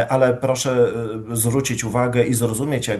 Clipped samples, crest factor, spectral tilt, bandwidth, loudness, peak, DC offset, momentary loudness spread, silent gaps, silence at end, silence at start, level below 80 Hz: under 0.1%; 16 dB; -5 dB/octave; 13 kHz; -20 LUFS; -4 dBFS; under 0.1%; 4 LU; none; 0 s; 0 s; -48 dBFS